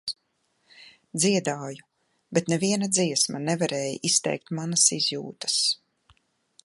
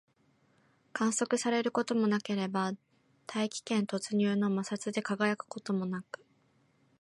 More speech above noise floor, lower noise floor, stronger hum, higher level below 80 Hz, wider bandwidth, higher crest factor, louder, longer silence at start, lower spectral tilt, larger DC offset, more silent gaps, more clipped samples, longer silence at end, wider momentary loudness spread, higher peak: first, 47 dB vs 38 dB; about the same, -72 dBFS vs -70 dBFS; neither; first, -72 dBFS vs -80 dBFS; about the same, 11.5 kHz vs 11.5 kHz; about the same, 22 dB vs 18 dB; first, -24 LUFS vs -32 LUFS; second, 0.05 s vs 0.95 s; second, -3 dB/octave vs -4.5 dB/octave; neither; neither; neither; about the same, 0.9 s vs 1 s; first, 15 LU vs 11 LU; first, -6 dBFS vs -14 dBFS